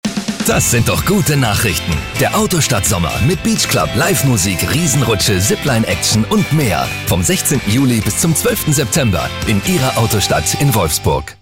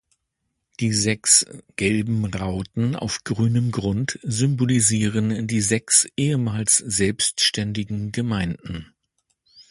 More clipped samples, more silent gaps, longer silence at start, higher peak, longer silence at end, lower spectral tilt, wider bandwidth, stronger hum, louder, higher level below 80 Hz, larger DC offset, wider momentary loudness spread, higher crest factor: neither; neither; second, 0.05 s vs 0.8 s; about the same, -4 dBFS vs -2 dBFS; about the same, 0.1 s vs 0.1 s; about the same, -4 dB/octave vs -3.5 dB/octave; first, 16.5 kHz vs 11.5 kHz; neither; first, -14 LUFS vs -21 LUFS; first, -32 dBFS vs -48 dBFS; first, 0.3% vs under 0.1%; second, 3 LU vs 11 LU; second, 10 dB vs 20 dB